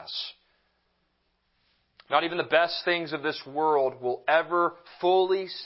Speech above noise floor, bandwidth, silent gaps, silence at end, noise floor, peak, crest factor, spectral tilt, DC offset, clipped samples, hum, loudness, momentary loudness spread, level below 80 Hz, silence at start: 47 dB; 5.8 kHz; none; 0 s; -73 dBFS; -6 dBFS; 22 dB; -8 dB/octave; under 0.1%; under 0.1%; none; -26 LUFS; 8 LU; -78 dBFS; 0 s